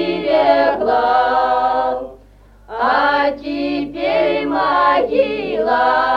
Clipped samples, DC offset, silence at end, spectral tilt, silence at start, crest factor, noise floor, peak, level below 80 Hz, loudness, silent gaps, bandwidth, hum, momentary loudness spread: under 0.1%; under 0.1%; 0 s; -6 dB/octave; 0 s; 16 dB; -45 dBFS; 0 dBFS; -46 dBFS; -16 LUFS; none; 7 kHz; 50 Hz at -45 dBFS; 8 LU